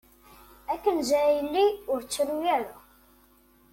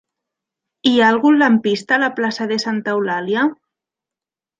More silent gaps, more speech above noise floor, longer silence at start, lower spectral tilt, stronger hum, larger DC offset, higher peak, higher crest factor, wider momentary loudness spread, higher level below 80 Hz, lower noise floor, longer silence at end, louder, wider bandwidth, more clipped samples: neither; second, 34 dB vs 73 dB; second, 0.7 s vs 0.85 s; second, -2.5 dB/octave vs -5 dB/octave; neither; neither; second, -12 dBFS vs -2 dBFS; about the same, 16 dB vs 16 dB; about the same, 10 LU vs 8 LU; first, -60 dBFS vs -68 dBFS; second, -60 dBFS vs -89 dBFS; about the same, 0.95 s vs 1.05 s; second, -26 LUFS vs -16 LUFS; first, 16.5 kHz vs 9 kHz; neither